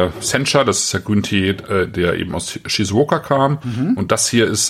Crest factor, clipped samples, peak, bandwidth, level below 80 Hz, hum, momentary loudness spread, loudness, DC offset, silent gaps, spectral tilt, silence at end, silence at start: 16 dB; under 0.1%; -2 dBFS; 16 kHz; -46 dBFS; none; 6 LU; -17 LUFS; under 0.1%; none; -4 dB/octave; 0 s; 0 s